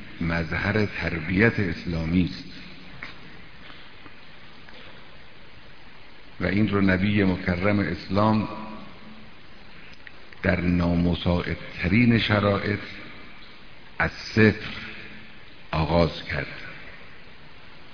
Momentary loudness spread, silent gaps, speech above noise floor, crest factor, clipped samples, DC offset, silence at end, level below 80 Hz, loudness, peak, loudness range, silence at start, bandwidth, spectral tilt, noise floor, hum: 24 LU; none; 25 dB; 24 dB; under 0.1%; 0.9%; 0.15 s; -44 dBFS; -24 LUFS; -2 dBFS; 10 LU; 0 s; 5.4 kHz; -7.5 dB/octave; -48 dBFS; none